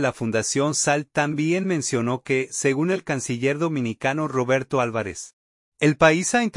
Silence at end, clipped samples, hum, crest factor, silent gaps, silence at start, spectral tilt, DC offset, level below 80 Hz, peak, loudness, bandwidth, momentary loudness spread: 0 s; under 0.1%; none; 20 dB; 5.33-5.72 s; 0 s; -4.5 dB/octave; under 0.1%; -58 dBFS; -2 dBFS; -22 LUFS; 11.5 kHz; 7 LU